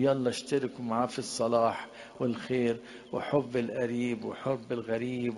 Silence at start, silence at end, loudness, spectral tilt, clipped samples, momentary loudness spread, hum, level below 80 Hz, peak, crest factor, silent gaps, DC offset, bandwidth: 0 s; 0 s; -31 LUFS; -5.5 dB/octave; under 0.1%; 7 LU; none; -68 dBFS; -14 dBFS; 18 dB; none; under 0.1%; 11.5 kHz